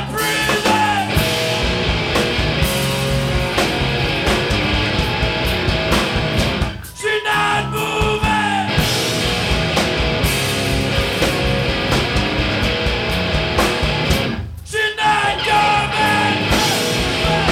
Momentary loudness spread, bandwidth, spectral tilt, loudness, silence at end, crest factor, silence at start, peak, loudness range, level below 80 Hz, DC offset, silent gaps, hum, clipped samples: 3 LU; 17 kHz; -4 dB/octave; -17 LUFS; 0 s; 16 dB; 0 s; -2 dBFS; 2 LU; -28 dBFS; under 0.1%; none; none; under 0.1%